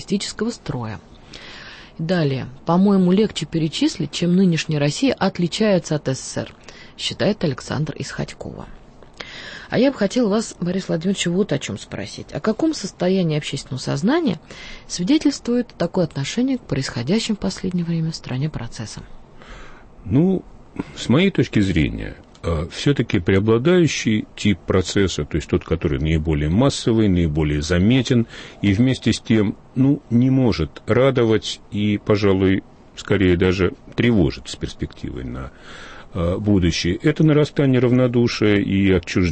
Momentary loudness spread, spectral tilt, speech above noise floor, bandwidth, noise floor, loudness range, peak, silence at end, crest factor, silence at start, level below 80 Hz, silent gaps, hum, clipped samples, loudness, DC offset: 15 LU; -6 dB/octave; 20 dB; 8.8 kHz; -39 dBFS; 5 LU; -6 dBFS; 0 s; 14 dB; 0 s; -38 dBFS; none; none; under 0.1%; -20 LUFS; under 0.1%